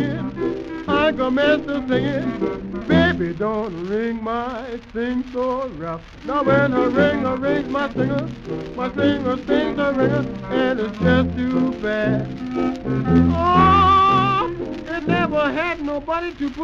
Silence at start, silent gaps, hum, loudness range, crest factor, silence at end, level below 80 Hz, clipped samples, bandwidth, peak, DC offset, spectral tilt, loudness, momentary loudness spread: 0 s; none; none; 5 LU; 16 dB; 0 s; -40 dBFS; under 0.1%; 7.4 kHz; -4 dBFS; under 0.1%; -7.5 dB/octave; -20 LUFS; 10 LU